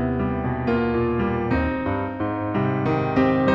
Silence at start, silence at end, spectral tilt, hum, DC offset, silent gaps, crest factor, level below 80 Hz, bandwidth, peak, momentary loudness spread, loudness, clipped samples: 0 s; 0 s; -9.5 dB/octave; none; under 0.1%; none; 14 dB; -40 dBFS; 6.6 kHz; -8 dBFS; 6 LU; -23 LUFS; under 0.1%